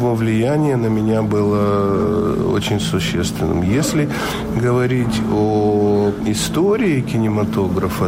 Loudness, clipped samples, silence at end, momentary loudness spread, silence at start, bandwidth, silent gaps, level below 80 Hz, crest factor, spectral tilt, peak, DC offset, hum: -17 LUFS; under 0.1%; 0 s; 3 LU; 0 s; 16 kHz; none; -38 dBFS; 10 dB; -6 dB/octave; -8 dBFS; under 0.1%; none